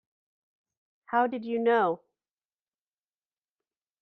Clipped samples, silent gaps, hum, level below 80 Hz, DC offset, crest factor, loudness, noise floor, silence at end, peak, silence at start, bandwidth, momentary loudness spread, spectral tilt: under 0.1%; none; none; -84 dBFS; under 0.1%; 20 dB; -27 LUFS; under -90 dBFS; 2.05 s; -12 dBFS; 1.1 s; 4.7 kHz; 6 LU; -7.5 dB/octave